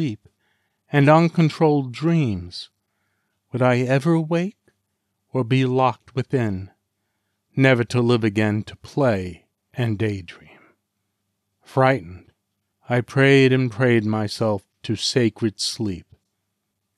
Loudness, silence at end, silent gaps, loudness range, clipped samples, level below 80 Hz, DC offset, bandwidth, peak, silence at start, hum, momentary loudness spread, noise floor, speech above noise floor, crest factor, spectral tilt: -20 LUFS; 0.95 s; none; 6 LU; under 0.1%; -60 dBFS; under 0.1%; 12 kHz; -4 dBFS; 0 s; none; 15 LU; -76 dBFS; 57 dB; 18 dB; -6.5 dB/octave